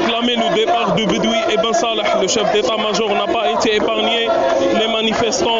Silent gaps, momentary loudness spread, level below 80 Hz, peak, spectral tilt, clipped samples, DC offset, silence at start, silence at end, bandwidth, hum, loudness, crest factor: none; 1 LU; -48 dBFS; -6 dBFS; -2 dB/octave; under 0.1%; under 0.1%; 0 s; 0 s; 8 kHz; none; -16 LUFS; 10 dB